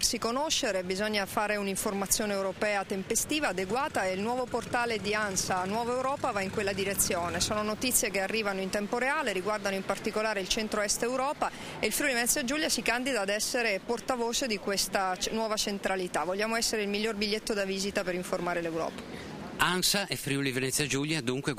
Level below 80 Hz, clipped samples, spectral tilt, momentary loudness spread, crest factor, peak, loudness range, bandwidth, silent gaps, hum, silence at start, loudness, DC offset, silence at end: -54 dBFS; under 0.1%; -2.5 dB/octave; 5 LU; 18 dB; -12 dBFS; 2 LU; 16 kHz; none; none; 0 s; -29 LUFS; under 0.1%; 0 s